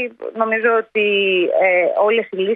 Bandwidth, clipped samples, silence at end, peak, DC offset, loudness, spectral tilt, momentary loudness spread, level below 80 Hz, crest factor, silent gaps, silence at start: 4.5 kHz; under 0.1%; 0 s; -2 dBFS; under 0.1%; -16 LUFS; -7.5 dB/octave; 5 LU; -72 dBFS; 14 dB; none; 0 s